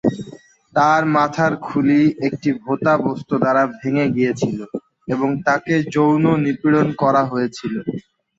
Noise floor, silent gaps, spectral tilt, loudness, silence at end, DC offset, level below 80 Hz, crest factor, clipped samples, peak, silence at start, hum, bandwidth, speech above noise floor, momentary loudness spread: -42 dBFS; none; -7 dB/octave; -18 LUFS; 0.4 s; under 0.1%; -58 dBFS; 16 dB; under 0.1%; -2 dBFS; 0.05 s; none; 7.8 kHz; 24 dB; 10 LU